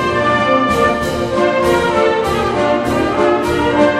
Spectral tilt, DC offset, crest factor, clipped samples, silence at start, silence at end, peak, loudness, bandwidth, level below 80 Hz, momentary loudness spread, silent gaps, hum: -5.5 dB/octave; under 0.1%; 12 dB; under 0.1%; 0 s; 0 s; 0 dBFS; -14 LUFS; 15.5 kHz; -36 dBFS; 3 LU; none; none